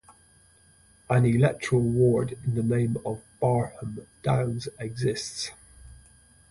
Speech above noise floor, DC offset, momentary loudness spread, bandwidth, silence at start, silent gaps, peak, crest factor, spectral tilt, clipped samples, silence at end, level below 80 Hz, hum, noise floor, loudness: 33 dB; under 0.1%; 13 LU; 11.5 kHz; 0.1 s; none; -10 dBFS; 18 dB; -6.5 dB/octave; under 0.1%; 0.55 s; -52 dBFS; none; -58 dBFS; -26 LUFS